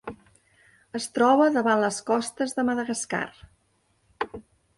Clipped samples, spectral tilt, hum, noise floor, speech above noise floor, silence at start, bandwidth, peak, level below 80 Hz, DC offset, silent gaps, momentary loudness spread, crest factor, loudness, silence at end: under 0.1%; -4 dB/octave; none; -68 dBFS; 44 dB; 0.05 s; 11.5 kHz; -8 dBFS; -62 dBFS; under 0.1%; none; 16 LU; 18 dB; -25 LUFS; 0.4 s